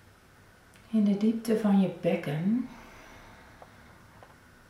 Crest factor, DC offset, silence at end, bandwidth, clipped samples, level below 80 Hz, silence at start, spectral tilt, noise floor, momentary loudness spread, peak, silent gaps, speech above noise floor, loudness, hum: 16 dB; under 0.1%; 1.35 s; 13 kHz; under 0.1%; -64 dBFS; 0.9 s; -8 dB/octave; -57 dBFS; 24 LU; -16 dBFS; none; 31 dB; -28 LUFS; none